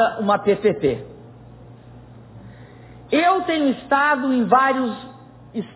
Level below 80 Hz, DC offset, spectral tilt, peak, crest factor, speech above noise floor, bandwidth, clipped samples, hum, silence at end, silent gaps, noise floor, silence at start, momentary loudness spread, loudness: -54 dBFS; under 0.1%; -9.5 dB/octave; -4 dBFS; 18 dB; 24 dB; 4 kHz; under 0.1%; none; 0.1 s; none; -43 dBFS; 0 s; 16 LU; -19 LUFS